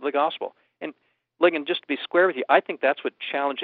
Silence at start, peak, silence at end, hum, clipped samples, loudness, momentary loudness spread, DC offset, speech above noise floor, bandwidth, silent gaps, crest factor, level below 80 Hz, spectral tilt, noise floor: 0 s; -4 dBFS; 0 s; none; under 0.1%; -23 LUFS; 17 LU; under 0.1%; 33 dB; 4.7 kHz; none; 22 dB; -88 dBFS; -0.5 dB/octave; -57 dBFS